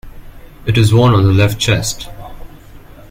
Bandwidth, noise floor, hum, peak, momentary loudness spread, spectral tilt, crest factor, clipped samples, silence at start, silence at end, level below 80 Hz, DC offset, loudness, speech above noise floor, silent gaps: 16.5 kHz; -36 dBFS; none; 0 dBFS; 18 LU; -5.5 dB/octave; 14 dB; under 0.1%; 0.05 s; 0.3 s; -32 dBFS; under 0.1%; -12 LUFS; 25 dB; none